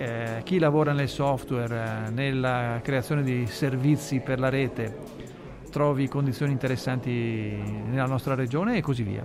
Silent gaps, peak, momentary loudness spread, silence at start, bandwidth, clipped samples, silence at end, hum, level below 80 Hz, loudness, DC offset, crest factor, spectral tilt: none; -12 dBFS; 8 LU; 0 s; 15 kHz; under 0.1%; 0 s; none; -52 dBFS; -27 LUFS; under 0.1%; 14 dB; -7 dB/octave